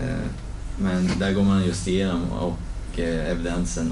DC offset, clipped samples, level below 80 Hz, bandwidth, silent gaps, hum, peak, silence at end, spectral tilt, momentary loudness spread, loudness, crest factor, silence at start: under 0.1%; under 0.1%; -32 dBFS; 11.5 kHz; none; none; -12 dBFS; 0 s; -6 dB/octave; 12 LU; -25 LUFS; 12 dB; 0 s